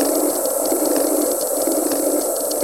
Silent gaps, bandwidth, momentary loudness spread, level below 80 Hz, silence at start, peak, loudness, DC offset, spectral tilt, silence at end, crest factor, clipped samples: none; 16.5 kHz; 2 LU; -62 dBFS; 0 s; -4 dBFS; -18 LUFS; 0.2%; -1.5 dB/octave; 0 s; 14 dB; under 0.1%